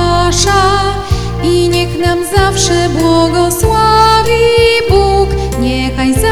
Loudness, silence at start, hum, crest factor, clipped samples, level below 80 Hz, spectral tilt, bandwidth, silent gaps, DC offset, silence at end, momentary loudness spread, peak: -10 LUFS; 0 s; none; 10 dB; 0.2%; -20 dBFS; -4.5 dB/octave; 19 kHz; none; 2%; 0 s; 6 LU; 0 dBFS